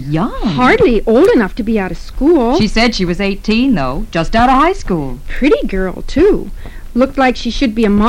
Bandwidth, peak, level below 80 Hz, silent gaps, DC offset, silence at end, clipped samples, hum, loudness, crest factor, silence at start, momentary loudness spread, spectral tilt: 13 kHz; -2 dBFS; -24 dBFS; none; under 0.1%; 0 s; under 0.1%; none; -13 LUFS; 10 dB; 0 s; 10 LU; -6 dB/octave